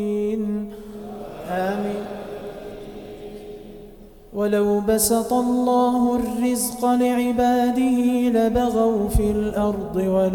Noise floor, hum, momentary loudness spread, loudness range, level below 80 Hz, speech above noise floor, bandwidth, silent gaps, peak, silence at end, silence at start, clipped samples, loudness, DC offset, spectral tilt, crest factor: -43 dBFS; none; 18 LU; 11 LU; -38 dBFS; 24 dB; 19 kHz; none; -6 dBFS; 0 s; 0 s; under 0.1%; -21 LUFS; under 0.1%; -5.5 dB/octave; 14 dB